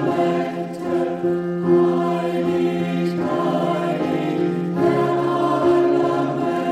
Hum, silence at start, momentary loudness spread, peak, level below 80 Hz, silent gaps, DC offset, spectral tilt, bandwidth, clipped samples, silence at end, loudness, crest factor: none; 0 s; 5 LU; -6 dBFS; -58 dBFS; none; under 0.1%; -8 dB/octave; 9.6 kHz; under 0.1%; 0 s; -20 LUFS; 14 dB